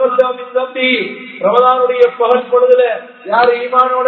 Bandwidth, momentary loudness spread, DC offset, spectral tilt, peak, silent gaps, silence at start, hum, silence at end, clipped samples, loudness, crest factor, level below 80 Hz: 4.5 kHz; 8 LU; under 0.1%; -6 dB/octave; 0 dBFS; none; 0 s; none; 0 s; 0.2%; -12 LUFS; 12 dB; -66 dBFS